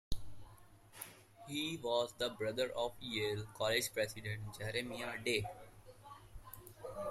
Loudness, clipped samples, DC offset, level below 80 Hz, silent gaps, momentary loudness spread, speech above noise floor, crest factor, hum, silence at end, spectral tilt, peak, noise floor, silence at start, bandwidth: -39 LUFS; under 0.1%; under 0.1%; -56 dBFS; none; 21 LU; 21 dB; 22 dB; none; 0 s; -3.5 dB/octave; -20 dBFS; -61 dBFS; 0.1 s; 16 kHz